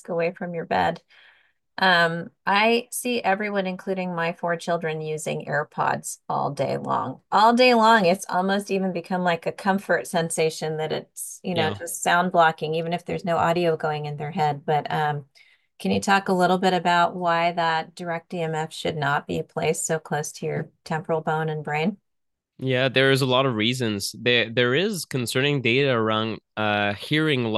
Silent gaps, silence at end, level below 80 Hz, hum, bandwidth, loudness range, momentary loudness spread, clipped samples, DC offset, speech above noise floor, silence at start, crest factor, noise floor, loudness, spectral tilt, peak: none; 0 s; -66 dBFS; none; 12.5 kHz; 6 LU; 10 LU; under 0.1%; under 0.1%; 57 dB; 0.1 s; 18 dB; -80 dBFS; -23 LUFS; -4.5 dB/octave; -4 dBFS